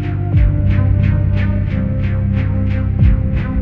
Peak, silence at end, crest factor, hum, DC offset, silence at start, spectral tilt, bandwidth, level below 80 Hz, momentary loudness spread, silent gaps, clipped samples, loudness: -2 dBFS; 0 s; 12 dB; none; under 0.1%; 0 s; -10.5 dB/octave; 4.1 kHz; -18 dBFS; 4 LU; none; under 0.1%; -16 LUFS